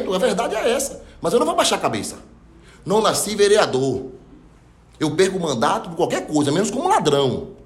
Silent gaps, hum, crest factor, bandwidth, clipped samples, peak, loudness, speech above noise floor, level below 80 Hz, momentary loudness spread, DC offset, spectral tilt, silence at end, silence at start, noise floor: none; none; 16 dB; 16 kHz; under 0.1%; -4 dBFS; -20 LUFS; 30 dB; -50 dBFS; 11 LU; under 0.1%; -4 dB/octave; 0.05 s; 0 s; -49 dBFS